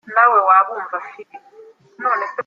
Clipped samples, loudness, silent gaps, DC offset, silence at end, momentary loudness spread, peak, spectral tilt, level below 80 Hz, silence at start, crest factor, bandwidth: under 0.1%; -16 LUFS; none; under 0.1%; 0.05 s; 16 LU; -2 dBFS; -5 dB/octave; -78 dBFS; 0.05 s; 16 dB; 6.6 kHz